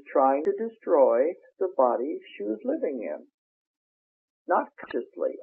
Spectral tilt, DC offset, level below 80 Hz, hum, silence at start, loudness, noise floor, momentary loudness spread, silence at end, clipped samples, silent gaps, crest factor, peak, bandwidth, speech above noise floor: -4.5 dB/octave; under 0.1%; -82 dBFS; none; 0.05 s; -27 LUFS; under -90 dBFS; 13 LU; 0 s; under 0.1%; 3.34-4.45 s; 18 dB; -8 dBFS; 4.3 kHz; over 64 dB